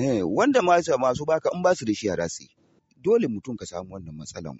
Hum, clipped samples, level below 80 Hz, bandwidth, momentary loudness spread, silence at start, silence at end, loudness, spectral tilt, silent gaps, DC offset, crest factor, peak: none; under 0.1%; -58 dBFS; 8 kHz; 17 LU; 0 s; 0 s; -24 LUFS; -5 dB/octave; none; under 0.1%; 16 dB; -8 dBFS